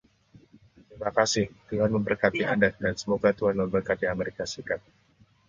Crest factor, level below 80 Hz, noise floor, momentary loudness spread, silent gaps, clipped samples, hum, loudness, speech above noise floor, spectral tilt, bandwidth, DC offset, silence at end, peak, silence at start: 22 dB; -54 dBFS; -62 dBFS; 9 LU; none; under 0.1%; none; -27 LUFS; 35 dB; -5 dB/octave; 9 kHz; under 0.1%; 0.7 s; -6 dBFS; 0.9 s